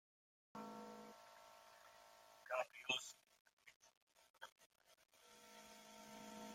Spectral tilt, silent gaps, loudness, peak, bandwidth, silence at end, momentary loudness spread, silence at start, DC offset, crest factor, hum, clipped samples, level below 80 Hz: -1.5 dB/octave; 3.40-3.45 s, 3.53-3.57 s, 3.76-3.81 s, 3.97-4.07 s, 4.30-4.34 s, 4.52-4.56 s, 4.66-4.70 s; -51 LUFS; -28 dBFS; 16.5 kHz; 0 s; 23 LU; 0.55 s; under 0.1%; 28 dB; none; under 0.1%; under -90 dBFS